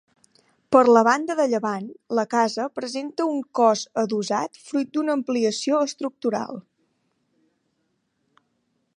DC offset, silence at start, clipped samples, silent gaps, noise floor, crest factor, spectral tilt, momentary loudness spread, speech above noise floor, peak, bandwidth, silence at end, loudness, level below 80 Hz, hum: under 0.1%; 0.7 s; under 0.1%; none; -72 dBFS; 22 dB; -4.5 dB/octave; 11 LU; 51 dB; -2 dBFS; 11 kHz; 2.35 s; -22 LUFS; -74 dBFS; none